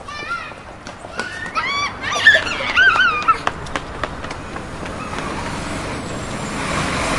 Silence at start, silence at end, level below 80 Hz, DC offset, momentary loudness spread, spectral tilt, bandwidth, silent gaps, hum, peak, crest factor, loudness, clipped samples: 0 s; 0 s; -38 dBFS; 0.1%; 17 LU; -3 dB/octave; 11.5 kHz; none; none; 0 dBFS; 20 dB; -18 LUFS; under 0.1%